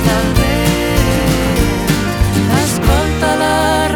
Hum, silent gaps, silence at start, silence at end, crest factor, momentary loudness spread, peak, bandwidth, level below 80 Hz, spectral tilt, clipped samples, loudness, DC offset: none; none; 0 s; 0 s; 12 dB; 2 LU; 0 dBFS; 20 kHz; -20 dBFS; -5 dB/octave; under 0.1%; -14 LUFS; under 0.1%